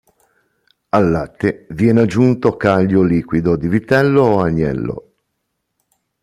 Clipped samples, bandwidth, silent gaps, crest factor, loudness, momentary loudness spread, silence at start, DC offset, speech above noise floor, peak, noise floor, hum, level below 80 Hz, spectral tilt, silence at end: under 0.1%; 12.5 kHz; none; 14 dB; -15 LUFS; 8 LU; 0.95 s; under 0.1%; 58 dB; -2 dBFS; -72 dBFS; none; -44 dBFS; -8.5 dB/octave; 1.25 s